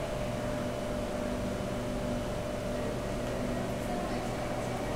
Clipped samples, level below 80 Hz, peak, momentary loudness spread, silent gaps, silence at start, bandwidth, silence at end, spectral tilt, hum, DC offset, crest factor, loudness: under 0.1%; -44 dBFS; -22 dBFS; 1 LU; none; 0 s; 16 kHz; 0 s; -6 dB/octave; none; 0.2%; 12 dB; -35 LUFS